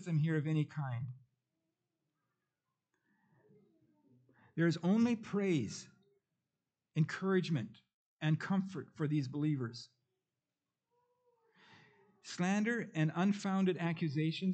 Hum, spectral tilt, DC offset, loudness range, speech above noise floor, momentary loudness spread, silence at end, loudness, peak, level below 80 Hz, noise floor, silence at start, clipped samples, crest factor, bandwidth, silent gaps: none; -7 dB/octave; under 0.1%; 8 LU; over 55 dB; 12 LU; 0 s; -36 LUFS; -20 dBFS; -86 dBFS; under -90 dBFS; 0 s; under 0.1%; 18 dB; 8.6 kHz; 7.94-8.17 s